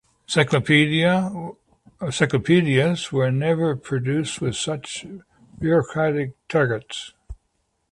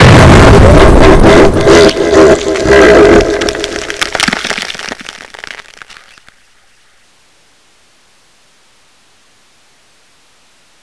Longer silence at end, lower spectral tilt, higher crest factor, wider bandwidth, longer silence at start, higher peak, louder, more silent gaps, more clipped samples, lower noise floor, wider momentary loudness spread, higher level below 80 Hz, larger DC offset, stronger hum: second, 0.6 s vs 5.2 s; about the same, -5.5 dB/octave vs -5.5 dB/octave; first, 20 dB vs 8 dB; about the same, 11.5 kHz vs 11 kHz; first, 0.3 s vs 0 s; about the same, -2 dBFS vs 0 dBFS; second, -21 LUFS vs -6 LUFS; neither; second, under 0.1% vs 6%; first, -71 dBFS vs -48 dBFS; second, 16 LU vs 22 LU; second, -52 dBFS vs -16 dBFS; neither; neither